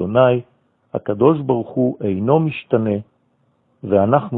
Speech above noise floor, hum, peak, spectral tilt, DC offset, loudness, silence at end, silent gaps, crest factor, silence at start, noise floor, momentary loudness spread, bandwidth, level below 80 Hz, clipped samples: 46 dB; none; -2 dBFS; -12.5 dB/octave; under 0.1%; -18 LUFS; 0 s; none; 16 dB; 0 s; -62 dBFS; 10 LU; 4.1 kHz; -58 dBFS; under 0.1%